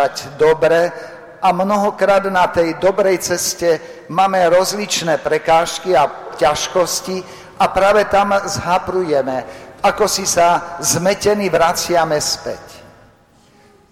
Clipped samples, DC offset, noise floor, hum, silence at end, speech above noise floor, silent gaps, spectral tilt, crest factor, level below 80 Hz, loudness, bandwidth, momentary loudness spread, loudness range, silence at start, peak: under 0.1%; under 0.1%; -50 dBFS; none; 1.1 s; 35 dB; none; -3 dB/octave; 12 dB; -46 dBFS; -16 LUFS; 16.5 kHz; 8 LU; 1 LU; 0 s; -4 dBFS